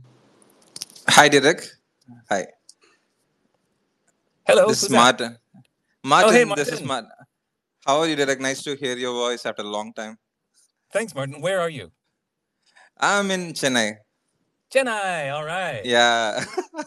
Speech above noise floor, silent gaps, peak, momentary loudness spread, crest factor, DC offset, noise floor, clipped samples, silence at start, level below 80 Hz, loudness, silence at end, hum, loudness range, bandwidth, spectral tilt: 58 dB; none; 0 dBFS; 15 LU; 22 dB; under 0.1%; -79 dBFS; under 0.1%; 0.8 s; -72 dBFS; -20 LUFS; 0 s; none; 9 LU; 14.5 kHz; -3 dB/octave